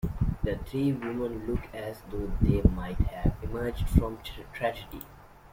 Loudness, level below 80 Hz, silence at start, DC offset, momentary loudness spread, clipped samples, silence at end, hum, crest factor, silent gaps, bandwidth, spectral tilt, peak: -30 LUFS; -34 dBFS; 0.05 s; under 0.1%; 14 LU; under 0.1%; 0.05 s; none; 24 dB; none; 16.5 kHz; -8 dB/octave; -6 dBFS